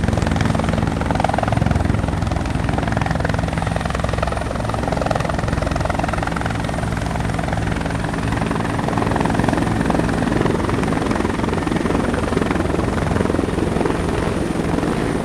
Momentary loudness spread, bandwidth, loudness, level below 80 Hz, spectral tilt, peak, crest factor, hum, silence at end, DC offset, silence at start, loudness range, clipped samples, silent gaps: 3 LU; 13.5 kHz; -20 LUFS; -28 dBFS; -6.5 dB/octave; -2 dBFS; 18 dB; none; 0 s; under 0.1%; 0 s; 2 LU; under 0.1%; none